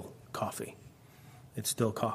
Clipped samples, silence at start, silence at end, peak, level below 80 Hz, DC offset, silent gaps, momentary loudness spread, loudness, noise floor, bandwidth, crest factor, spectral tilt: under 0.1%; 0 s; 0 s; -14 dBFS; -70 dBFS; under 0.1%; none; 24 LU; -36 LUFS; -56 dBFS; 15.5 kHz; 22 dB; -4.5 dB/octave